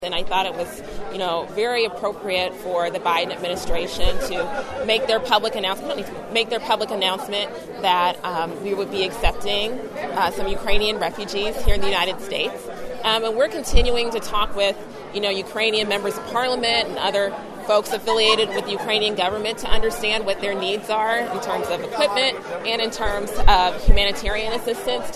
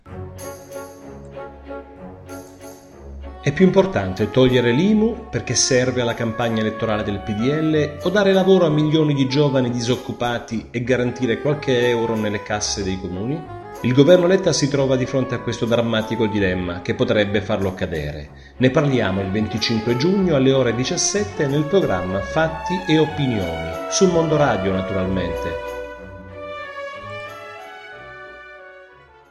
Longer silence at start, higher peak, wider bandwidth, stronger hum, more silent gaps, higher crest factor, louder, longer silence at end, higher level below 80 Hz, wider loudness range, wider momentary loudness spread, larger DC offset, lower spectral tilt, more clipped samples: about the same, 0 s vs 0.05 s; about the same, 0 dBFS vs 0 dBFS; about the same, 13.5 kHz vs 12.5 kHz; neither; neither; about the same, 20 dB vs 20 dB; second, -22 LUFS vs -19 LUFS; second, 0 s vs 0.45 s; first, -30 dBFS vs -44 dBFS; second, 3 LU vs 7 LU; second, 7 LU vs 20 LU; neither; second, -3.5 dB/octave vs -5 dB/octave; neither